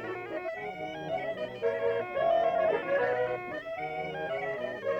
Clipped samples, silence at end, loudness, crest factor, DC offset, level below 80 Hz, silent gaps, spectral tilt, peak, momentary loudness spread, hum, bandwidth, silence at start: under 0.1%; 0 s; -32 LUFS; 14 dB; under 0.1%; -66 dBFS; none; -6 dB/octave; -18 dBFS; 10 LU; none; 7.6 kHz; 0 s